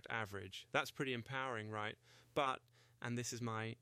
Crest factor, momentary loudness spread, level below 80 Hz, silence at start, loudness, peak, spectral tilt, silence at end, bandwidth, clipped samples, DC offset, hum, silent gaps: 22 dB; 9 LU; -78 dBFS; 0.05 s; -43 LUFS; -22 dBFS; -4 dB/octave; 0.05 s; 15.5 kHz; under 0.1%; under 0.1%; none; none